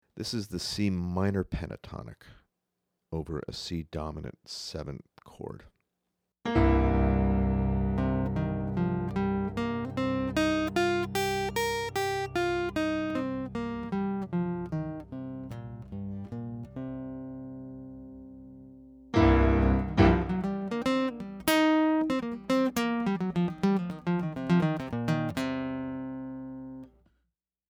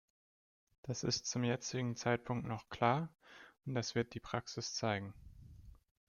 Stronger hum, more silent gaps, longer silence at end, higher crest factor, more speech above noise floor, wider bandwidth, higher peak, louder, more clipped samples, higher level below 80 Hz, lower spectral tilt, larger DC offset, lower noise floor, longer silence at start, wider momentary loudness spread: neither; neither; first, 0.85 s vs 0.35 s; about the same, 22 dB vs 20 dB; first, 49 dB vs 19 dB; first, over 20 kHz vs 7.4 kHz; first, -8 dBFS vs -20 dBFS; first, -29 LUFS vs -39 LUFS; neither; first, -40 dBFS vs -66 dBFS; first, -6.5 dB/octave vs -4.5 dB/octave; neither; first, -83 dBFS vs -57 dBFS; second, 0.15 s vs 0.85 s; second, 18 LU vs 23 LU